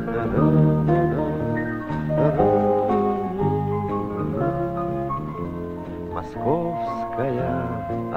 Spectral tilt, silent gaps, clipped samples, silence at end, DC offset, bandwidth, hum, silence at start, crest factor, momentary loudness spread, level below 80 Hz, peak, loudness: -10 dB/octave; none; under 0.1%; 0 s; under 0.1%; 5.2 kHz; none; 0 s; 18 dB; 11 LU; -42 dBFS; -4 dBFS; -23 LUFS